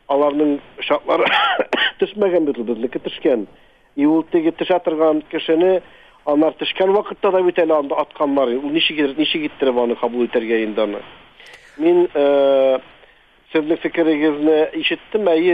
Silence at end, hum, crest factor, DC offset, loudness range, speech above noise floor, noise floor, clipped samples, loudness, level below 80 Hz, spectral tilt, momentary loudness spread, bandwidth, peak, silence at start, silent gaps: 0 s; none; 14 dB; 0.2%; 2 LU; 33 dB; -51 dBFS; under 0.1%; -18 LUFS; -58 dBFS; -6.5 dB/octave; 7 LU; 5.4 kHz; -4 dBFS; 0.1 s; none